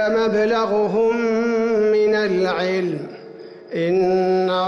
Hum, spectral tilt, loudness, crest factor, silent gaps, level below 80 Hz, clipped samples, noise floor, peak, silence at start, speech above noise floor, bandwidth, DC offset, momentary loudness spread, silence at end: none; -6.5 dB/octave; -19 LUFS; 8 dB; none; -58 dBFS; under 0.1%; -38 dBFS; -10 dBFS; 0 s; 20 dB; 7 kHz; under 0.1%; 12 LU; 0 s